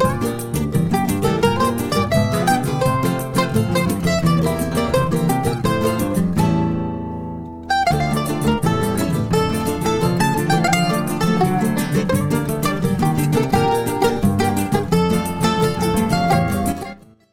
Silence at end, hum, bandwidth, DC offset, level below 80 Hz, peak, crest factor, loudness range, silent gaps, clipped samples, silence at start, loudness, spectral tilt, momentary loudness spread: 0.35 s; none; 16.5 kHz; under 0.1%; -38 dBFS; -2 dBFS; 16 dB; 2 LU; none; under 0.1%; 0 s; -19 LUFS; -6 dB/octave; 4 LU